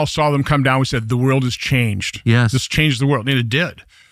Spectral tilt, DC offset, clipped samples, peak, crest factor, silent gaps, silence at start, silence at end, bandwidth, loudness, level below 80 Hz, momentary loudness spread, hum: -5.5 dB/octave; under 0.1%; under 0.1%; 0 dBFS; 16 dB; none; 0 s; 0.3 s; 15 kHz; -17 LUFS; -40 dBFS; 4 LU; none